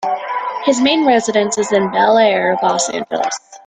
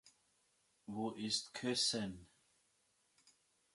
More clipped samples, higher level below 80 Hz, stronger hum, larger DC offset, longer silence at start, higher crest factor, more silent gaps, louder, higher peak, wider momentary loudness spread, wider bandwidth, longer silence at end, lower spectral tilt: neither; first, -60 dBFS vs -76 dBFS; neither; neither; about the same, 0 s vs 0.05 s; second, 14 dB vs 22 dB; neither; first, -15 LUFS vs -39 LUFS; first, -2 dBFS vs -24 dBFS; second, 8 LU vs 17 LU; second, 9.6 kHz vs 11.5 kHz; second, 0.1 s vs 1.5 s; about the same, -3 dB/octave vs -2.5 dB/octave